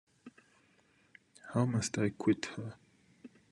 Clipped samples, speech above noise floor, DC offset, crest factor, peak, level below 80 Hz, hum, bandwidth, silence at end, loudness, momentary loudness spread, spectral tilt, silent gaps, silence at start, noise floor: under 0.1%; 36 dB; under 0.1%; 22 dB; -16 dBFS; -74 dBFS; none; 12 kHz; 0.25 s; -34 LUFS; 15 LU; -5.5 dB/octave; none; 0.25 s; -69 dBFS